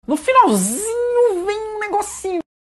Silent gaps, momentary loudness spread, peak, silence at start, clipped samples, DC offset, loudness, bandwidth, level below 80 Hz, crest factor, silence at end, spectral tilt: none; 11 LU; 0 dBFS; 0.1 s; under 0.1%; under 0.1%; -18 LUFS; 13 kHz; -52 dBFS; 16 dB; 0.2 s; -4 dB/octave